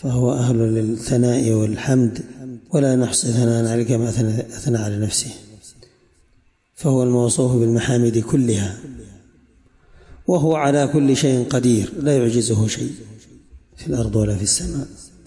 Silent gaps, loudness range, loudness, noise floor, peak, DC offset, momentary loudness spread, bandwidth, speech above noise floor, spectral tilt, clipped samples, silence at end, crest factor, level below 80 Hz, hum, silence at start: none; 3 LU; -19 LUFS; -58 dBFS; -6 dBFS; under 0.1%; 11 LU; 11.5 kHz; 40 dB; -5.5 dB/octave; under 0.1%; 0.2 s; 14 dB; -44 dBFS; none; 0.05 s